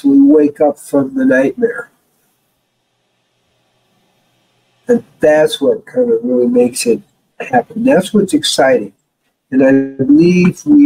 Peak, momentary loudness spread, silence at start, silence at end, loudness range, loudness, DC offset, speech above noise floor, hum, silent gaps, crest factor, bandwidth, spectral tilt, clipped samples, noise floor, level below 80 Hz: 0 dBFS; 8 LU; 0.05 s; 0 s; 8 LU; -12 LUFS; under 0.1%; 54 dB; none; none; 12 dB; 15.5 kHz; -5.5 dB/octave; under 0.1%; -66 dBFS; -54 dBFS